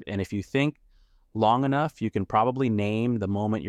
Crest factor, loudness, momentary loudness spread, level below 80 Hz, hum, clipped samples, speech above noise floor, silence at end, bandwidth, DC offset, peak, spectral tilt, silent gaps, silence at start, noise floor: 16 dB; -26 LUFS; 7 LU; -58 dBFS; none; under 0.1%; 34 dB; 0 s; 11.5 kHz; under 0.1%; -10 dBFS; -7.5 dB/octave; none; 0 s; -59 dBFS